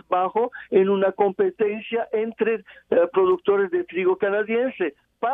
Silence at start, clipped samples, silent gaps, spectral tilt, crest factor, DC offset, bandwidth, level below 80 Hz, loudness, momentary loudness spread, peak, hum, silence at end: 0.1 s; under 0.1%; none; -9 dB/octave; 16 dB; under 0.1%; 3.8 kHz; -68 dBFS; -22 LUFS; 7 LU; -6 dBFS; none; 0 s